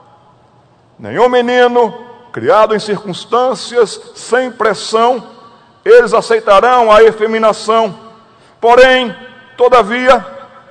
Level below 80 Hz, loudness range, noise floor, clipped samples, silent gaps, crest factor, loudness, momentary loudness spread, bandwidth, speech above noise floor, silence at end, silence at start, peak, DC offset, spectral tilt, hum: -44 dBFS; 4 LU; -47 dBFS; 2%; none; 12 dB; -10 LUFS; 13 LU; 11 kHz; 38 dB; 0.25 s; 1 s; 0 dBFS; under 0.1%; -4 dB/octave; none